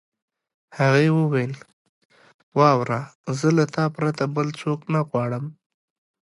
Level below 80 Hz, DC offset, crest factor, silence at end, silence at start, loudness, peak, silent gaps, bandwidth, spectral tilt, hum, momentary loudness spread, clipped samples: -66 dBFS; under 0.1%; 20 dB; 0.8 s; 0.75 s; -22 LUFS; -4 dBFS; 1.73-2.10 s, 2.34-2.52 s, 3.15-3.24 s; 11.5 kHz; -7 dB/octave; none; 12 LU; under 0.1%